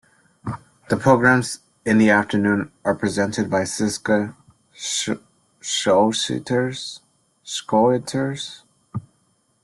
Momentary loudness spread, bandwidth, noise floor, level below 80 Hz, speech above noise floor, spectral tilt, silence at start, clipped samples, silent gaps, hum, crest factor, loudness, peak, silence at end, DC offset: 18 LU; 12.5 kHz; -65 dBFS; -58 dBFS; 45 dB; -4.5 dB/octave; 0.45 s; under 0.1%; none; none; 20 dB; -20 LUFS; -2 dBFS; 0.65 s; under 0.1%